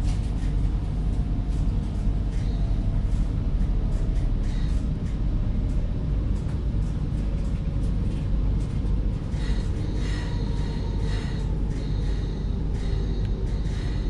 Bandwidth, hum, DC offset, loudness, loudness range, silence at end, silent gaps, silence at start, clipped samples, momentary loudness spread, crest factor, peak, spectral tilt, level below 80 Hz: 8.8 kHz; none; under 0.1%; -28 LUFS; 1 LU; 0 s; none; 0 s; under 0.1%; 2 LU; 12 dB; -12 dBFS; -8 dB/octave; -26 dBFS